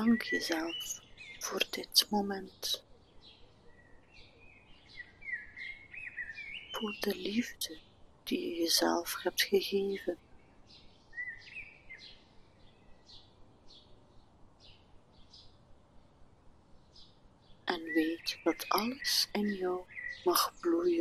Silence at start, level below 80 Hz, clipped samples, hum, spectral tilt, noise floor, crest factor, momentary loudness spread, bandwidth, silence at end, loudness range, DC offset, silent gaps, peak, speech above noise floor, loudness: 0 s; -64 dBFS; under 0.1%; none; -2.5 dB/octave; -59 dBFS; 26 dB; 18 LU; 13.5 kHz; 0 s; 16 LU; under 0.1%; none; -12 dBFS; 26 dB; -34 LUFS